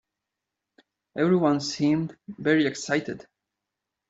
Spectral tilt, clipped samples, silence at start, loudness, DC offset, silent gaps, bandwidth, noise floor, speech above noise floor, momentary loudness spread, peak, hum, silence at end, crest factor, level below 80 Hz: -5.5 dB/octave; under 0.1%; 1.15 s; -25 LUFS; under 0.1%; none; 8 kHz; -86 dBFS; 61 dB; 15 LU; -8 dBFS; none; 0.9 s; 20 dB; -68 dBFS